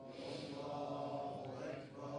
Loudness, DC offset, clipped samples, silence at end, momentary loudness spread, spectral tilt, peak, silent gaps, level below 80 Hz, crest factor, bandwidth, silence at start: -46 LUFS; under 0.1%; under 0.1%; 0 s; 4 LU; -6 dB/octave; -32 dBFS; none; -78 dBFS; 14 dB; 10 kHz; 0 s